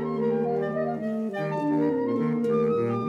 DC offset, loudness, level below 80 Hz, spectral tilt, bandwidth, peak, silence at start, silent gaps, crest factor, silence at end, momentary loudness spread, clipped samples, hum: under 0.1%; -26 LUFS; -64 dBFS; -9 dB/octave; 7.2 kHz; -14 dBFS; 0 s; none; 12 dB; 0 s; 5 LU; under 0.1%; none